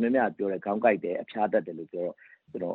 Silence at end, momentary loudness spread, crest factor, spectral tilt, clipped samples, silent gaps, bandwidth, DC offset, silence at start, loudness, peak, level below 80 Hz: 0 s; 11 LU; 18 dB; -9.5 dB/octave; under 0.1%; none; 4.2 kHz; under 0.1%; 0 s; -29 LUFS; -10 dBFS; -74 dBFS